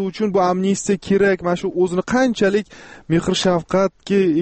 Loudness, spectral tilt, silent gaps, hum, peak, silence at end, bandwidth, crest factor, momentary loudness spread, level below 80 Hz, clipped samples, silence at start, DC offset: -18 LUFS; -5.5 dB/octave; none; none; -6 dBFS; 0 s; 8.8 kHz; 12 dB; 4 LU; -48 dBFS; under 0.1%; 0 s; under 0.1%